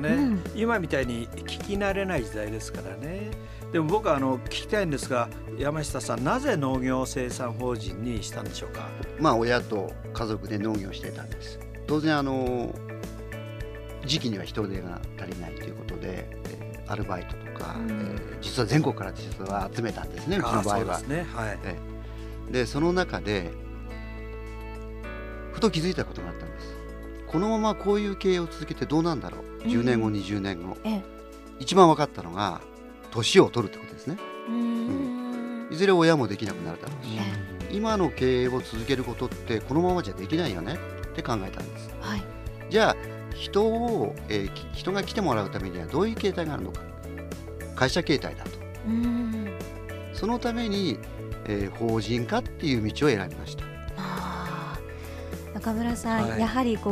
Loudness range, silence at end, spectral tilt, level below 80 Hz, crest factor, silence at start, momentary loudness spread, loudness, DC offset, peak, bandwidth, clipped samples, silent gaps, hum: 6 LU; 0 s; -5.5 dB/octave; -42 dBFS; 26 dB; 0 s; 14 LU; -28 LUFS; under 0.1%; -2 dBFS; 15.5 kHz; under 0.1%; none; none